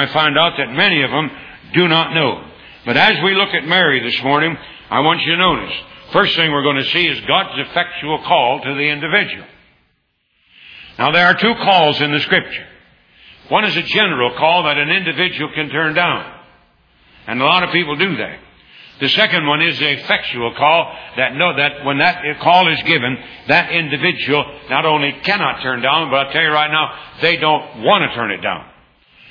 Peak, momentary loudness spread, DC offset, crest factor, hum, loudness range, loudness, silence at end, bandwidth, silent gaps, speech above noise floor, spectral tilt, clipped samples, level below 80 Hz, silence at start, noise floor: 0 dBFS; 9 LU; under 0.1%; 16 dB; none; 3 LU; -14 LUFS; 0.65 s; 5.4 kHz; none; 48 dB; -6 dB/octave; under 0.1%; -52 dBFS; 0 s; -64 dBFS